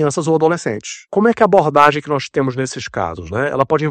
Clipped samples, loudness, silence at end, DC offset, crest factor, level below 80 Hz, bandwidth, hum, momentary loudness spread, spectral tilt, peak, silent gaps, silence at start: 0.3%; -16 LUFS; 0 s; under 0.1%; 16 dB; -50 dBFS; 10 kHz; none; 11 LU; -5.5 dB/octave; 0 dBFS; none; 0 s